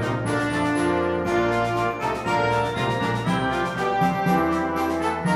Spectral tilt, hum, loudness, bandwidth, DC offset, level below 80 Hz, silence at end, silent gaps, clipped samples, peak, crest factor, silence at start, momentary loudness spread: -6 dB/octave; none; -23 LUFS; 15 kHz; under 0.1%; -46 dBFS; 0 s; none; under 0.1%; -8 dBFS; 14 dB; 0 s; 3 LU